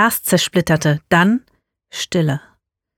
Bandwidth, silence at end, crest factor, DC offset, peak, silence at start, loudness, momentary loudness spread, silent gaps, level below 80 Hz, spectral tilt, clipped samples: 19.5 kHz; 0.6 s; 16 dB; under 0.1%; -2 dBFS; 0 s; -17 LUFS; 12 LU; none; -50 dBFS; -4.5 dB/octave; under 0.1%